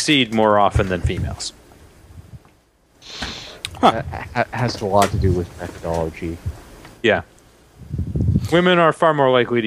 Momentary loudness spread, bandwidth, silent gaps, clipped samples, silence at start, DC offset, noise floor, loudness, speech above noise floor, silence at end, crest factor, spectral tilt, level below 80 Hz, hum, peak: 15 LU; 15.5 kHz; none; under 0.1%; 0 s; under 0.1%; -56 dBFS; -19 LUFS; 38 dB; 0 s; 18 dB; -5.5 dB/octave; -36 dBFS; none; 0 dBFS